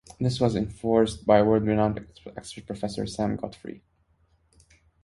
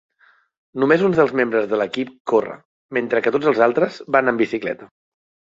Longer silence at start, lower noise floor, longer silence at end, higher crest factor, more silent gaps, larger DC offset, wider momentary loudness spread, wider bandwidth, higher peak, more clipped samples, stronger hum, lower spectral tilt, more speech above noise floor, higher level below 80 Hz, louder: second, 0.2 s vs 0.75 s; first, -66 dBFS vs -57 dBFS; first, 1.25 s vs 0.7 s; about the same, 22 dB vs 20 dB; second, none vs 2.20-2.25 s, 2.65-2.89 s; neither; first, 20 LU vs 11 LU; first, 11.5 kHz vs 7.6 kHz; second, -6 dBFS vs 0 dBFS; neither; neither; about the same, -7 dB/octave vs -7 dB/octave; about the same, 41 dB vs 39 dB; first, -50 dBFS vs -62 dBFS; second, -25 LUFS vs -19 LUFS